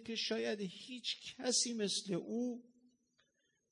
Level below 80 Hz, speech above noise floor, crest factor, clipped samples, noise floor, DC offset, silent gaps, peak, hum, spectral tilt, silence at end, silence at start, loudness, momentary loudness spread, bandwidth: -88 dBFS; 41 dB; 20 dB; under 0.1%; -81 dBFS; under 0.1%; none; -22 dBFS; none; -2.5 dB/octave; 1.1 s; 0 s; -38 LUFS; 10 LU; 11 kHz